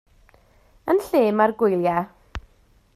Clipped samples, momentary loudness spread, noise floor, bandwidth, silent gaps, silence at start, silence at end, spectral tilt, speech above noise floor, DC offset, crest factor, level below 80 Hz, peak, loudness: under 0.1%; 21 LU; -58 dBFS; 15 kHz; none; 0.85 s; 0.55 s; -7 dB/octave; 38 dB; under 0.1%; 18 dB; -50 dBFS; -6 dBFS; -21 LUFS